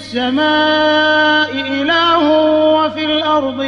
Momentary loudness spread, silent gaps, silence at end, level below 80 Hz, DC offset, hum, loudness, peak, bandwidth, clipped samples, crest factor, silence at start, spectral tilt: 5 LU; none; 0 s; -54 dBFS; under 0.1%; none; -12 LUFS; -2 dBFS; 7.2 kHz; under 0.1%; 12 dB; 0 s; -4.5 dB/octave